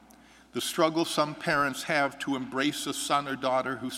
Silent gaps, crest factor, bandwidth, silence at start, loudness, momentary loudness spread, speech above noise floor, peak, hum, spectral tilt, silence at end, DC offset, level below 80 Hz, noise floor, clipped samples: none; 20 dB; 16 kHz; 0.55 s; -28 LUFS; 5 LU; 27 dB; -10 dBFS; none; -3.5 dB/octave; 0 s; under 0.1%; -64 dBFS; -55 dBFS; under 0.1%